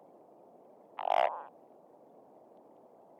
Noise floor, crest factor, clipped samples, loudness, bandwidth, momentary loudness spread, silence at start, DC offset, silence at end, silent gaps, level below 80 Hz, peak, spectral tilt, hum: -59 dBFS; 22 dB; under 0.1%; -33 LUFS; 10.5 kHz; 28 LU; 1 s; under 0.1%; 1.7 s; none; under -90 dBFS; -16 dBFS; -3.5 dB/octave; none